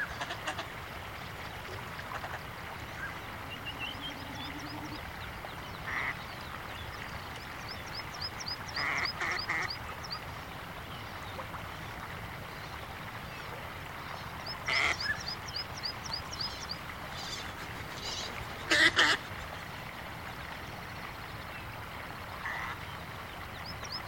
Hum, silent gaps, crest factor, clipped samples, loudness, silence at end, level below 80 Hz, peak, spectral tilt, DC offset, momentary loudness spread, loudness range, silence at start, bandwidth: none; none; 28 dB; under 0.1%; -36 LUFS; 0 s; -54 dBFS; -8 dBFS; -3 dB/octave; under 0.1%; 11 LU; 11 LU; 0 s; 17 kHz